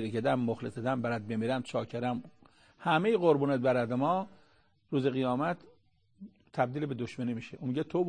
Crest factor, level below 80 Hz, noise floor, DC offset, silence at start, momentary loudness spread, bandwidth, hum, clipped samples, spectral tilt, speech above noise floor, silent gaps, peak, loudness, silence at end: 20 dB; -70 dBFS; -68 dBFS; under 0.1%; 0 s; 10 LU; 9.8 kHz; none; under 0.1%; -7.5 dB/octave; 37 dB; none; -12 dBFS; -32 LUFS; 0 s